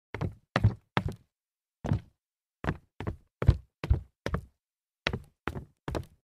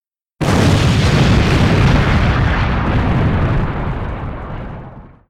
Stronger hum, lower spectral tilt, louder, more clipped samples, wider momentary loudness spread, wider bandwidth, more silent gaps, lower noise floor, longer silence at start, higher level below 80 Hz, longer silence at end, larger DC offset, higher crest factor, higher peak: neither; about the same, -7 dB/octave vs -6.5 dB/octave; second, -34 LUFS vs -14 LUFS; neither; about the same, 12 LU vs 14 LU; second, 11.5 kHz vs 13.5 kHz; neither; first, under -90 dBFS vs -35 dBFS; second, 0.15 s vs 0.4 s; second, -40 dBFS vs -22 dBFS; about the same, 0.2 s vs 0.2 s; neither; first, 28 dB vs 10 dB; about the same, -6 dBFS vs -4 dBFS